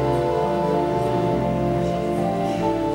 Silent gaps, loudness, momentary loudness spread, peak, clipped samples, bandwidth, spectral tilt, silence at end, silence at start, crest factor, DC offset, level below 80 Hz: none; -22 LUFS; 2 LU; -8 dBFS; under 0.1%; 16 kHz; -7.5 dB/octave; 0 s; 0 s; 12 dB; under 0.1%; -40 dBFS